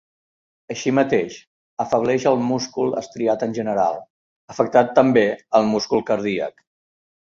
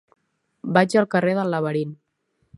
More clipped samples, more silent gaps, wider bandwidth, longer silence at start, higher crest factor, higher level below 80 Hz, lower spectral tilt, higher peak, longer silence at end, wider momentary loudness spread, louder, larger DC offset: neither; first, 1.47-1.77 s, 4.10-4.48 s vs none; second, 7.6 kHz vs 11.5 kHz; about the same, 0.7 s vs 0.65 s; about the same, 18 dB vs 22 dB; first, -60 dBFS vs -66 dBFS; about the same, -5.5 dB/octave vs -6.5 dB/octave; about the same, -2 dBFS vs -2 dBFS; first, 0.85 s vs 0.65 s; about the same, 14 LU vs 12 LU; about the same, -20 LUFS vs -21 LUFS; neither